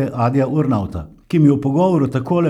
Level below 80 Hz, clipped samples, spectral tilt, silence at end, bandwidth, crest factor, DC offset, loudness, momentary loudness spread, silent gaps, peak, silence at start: -44 dBFS; under 0.1%; -9.5 dB/octave; 0 s; 11 kHz; 14 dB; under 0.1%; -17 LUFS; 7 LU; none; -2 dBFS; 0 s